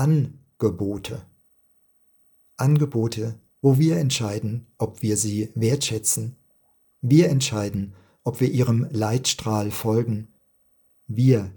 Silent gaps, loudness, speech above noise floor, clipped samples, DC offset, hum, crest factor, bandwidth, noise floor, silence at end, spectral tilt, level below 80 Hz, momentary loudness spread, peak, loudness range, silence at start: none; -23 LUFS; 40 dB; under 0.1%; under 0.1%; none; 18 dB; 18 kHz; -62 dBFS; 0 s; -5.5 dB/octave; -58 dBFS; 12 LU; -6 dBFS; 3 LU; 0 s